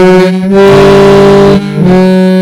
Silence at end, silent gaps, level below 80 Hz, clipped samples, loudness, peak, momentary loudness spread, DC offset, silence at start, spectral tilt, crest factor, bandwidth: 0 s; none; -28 dBFS; 20%; -4 LUFS; 0 dBFS; 4 LU; 3%; 0 s; -7 dB/octave; 4 dB; 12.5 kHz